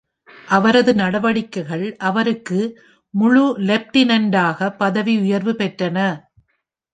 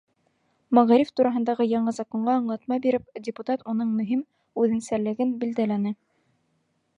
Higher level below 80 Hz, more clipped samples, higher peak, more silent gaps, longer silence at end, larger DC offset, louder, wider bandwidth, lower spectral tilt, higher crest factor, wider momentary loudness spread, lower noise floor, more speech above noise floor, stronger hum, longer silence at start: first, -60 dBFS vs -68 dBFS; neither; about the same, -2 dBFS vs -4 dBFS; neither; second, 0.75 s vs 1.05 s; neither; first, -18 LUFS vs -25 LUFS; second, 9.2 kHz vs 10.5 kHz; about the same, -6 dB/octave vs -7 dB/octave; about the same, 16 dB vs 20 dB; about the same, 9 LU vs 10 LU; about the same, -71 dBFS vs -71 dBFS; first, 54 dB vs 48 dB; neither; second, 0.45 s vs 0.7 s